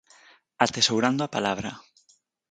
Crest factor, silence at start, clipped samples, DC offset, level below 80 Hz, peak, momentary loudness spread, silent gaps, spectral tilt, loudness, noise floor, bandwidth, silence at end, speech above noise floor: 24 dB; 0.6 s; under 0.1%; under 0.1%; -62 dBFS; -4 dBFS; 14 LU; none; -3 dB/octave; -24 LUFS; -65 dBFS; 9.4 kHz; 0.7 s; 40 dB